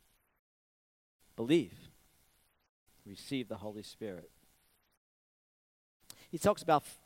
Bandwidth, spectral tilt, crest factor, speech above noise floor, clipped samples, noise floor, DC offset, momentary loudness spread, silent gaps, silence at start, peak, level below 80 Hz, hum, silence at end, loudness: 16 kHz; -5.5 dB/octave; 24 dB; 38 dB; under 0.1%; -72 dBFS; under 0.1%; 21 LU; 2.69-2.86 s, 4.97-6.00 s; 1.4 s; -14 dBFS; -68 dBFS; none; 0.1 s; -35 LUFS